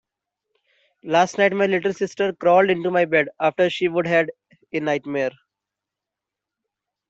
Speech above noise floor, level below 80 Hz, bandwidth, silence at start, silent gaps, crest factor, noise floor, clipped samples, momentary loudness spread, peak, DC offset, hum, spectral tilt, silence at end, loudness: 66 dB; -68 dBFS; 8 kHz; 1.05 s; none; 18 dB; -86 dBFS; under 0.1%; 9 LU; -4 dBFS; under 0.1%; none; -5.5 dB/octave; 1.8 s; -20 LUFS